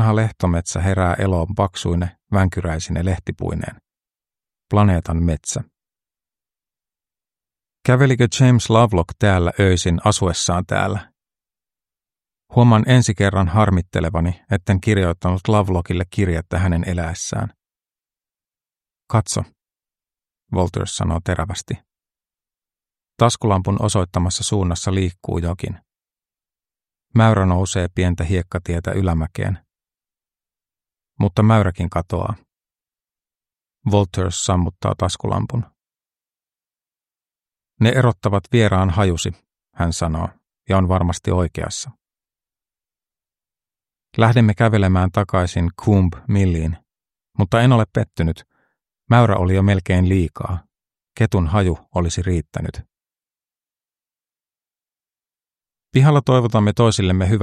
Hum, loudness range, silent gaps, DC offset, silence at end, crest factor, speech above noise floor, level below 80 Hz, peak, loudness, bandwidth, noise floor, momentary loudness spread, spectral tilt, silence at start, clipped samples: none; 7 LU; none; under 0.1%; 0 s; 20 dB; over 73 dB; -36 dBFS; 0 dBFS; -18 LUFS; 12 kHz; under -90 dBFS; 11 LU; -6 dB/octave; 0 s; under 0.1%